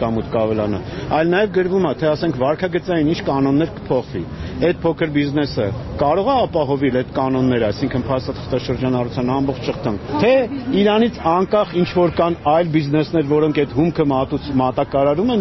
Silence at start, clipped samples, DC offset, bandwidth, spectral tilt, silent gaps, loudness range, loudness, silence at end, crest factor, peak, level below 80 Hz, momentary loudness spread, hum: 0 s; under 0.1%; under 0.1%; 6.2 kHz; -6 dB/octave; none; 3 LU; -18 LUFS; 0 s; 14 dB; -4 dBFS; -40 dBFS; 6 LU; none